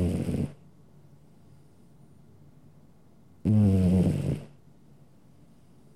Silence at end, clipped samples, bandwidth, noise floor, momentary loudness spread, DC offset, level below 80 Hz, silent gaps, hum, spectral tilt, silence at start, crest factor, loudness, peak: 1.5 s; under 0.1%; 12.5 kHz; -58 dBFS; 14 LU; 0.1%; -50 dBFS; none; none; -9 dB/octave; 0 s; 16 dB; -26 LUFS; -14 dBFS